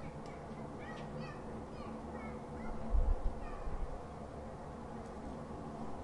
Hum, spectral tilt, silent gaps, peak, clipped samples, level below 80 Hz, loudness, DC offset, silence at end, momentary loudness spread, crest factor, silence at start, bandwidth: none; -7.5 dB/octave; none; -20 dBFS; under 0.1%; -42 dBFS; -45 LUFS; under 0.1%; 0 s; 8 LU; 20 dB; 0 s; 11 kHz